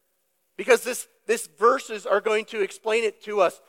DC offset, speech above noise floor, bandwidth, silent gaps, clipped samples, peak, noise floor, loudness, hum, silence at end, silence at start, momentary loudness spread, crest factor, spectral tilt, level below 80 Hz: under 0.1%; 48 dB; 16.5 kHz; none; under 0.1%; -4 dBFS; -72 dBFS; -24 LUFS; none; 0.15 s; 0.6 s; 8 LU; 20 dB; -2 dB/octave; -86 dBFS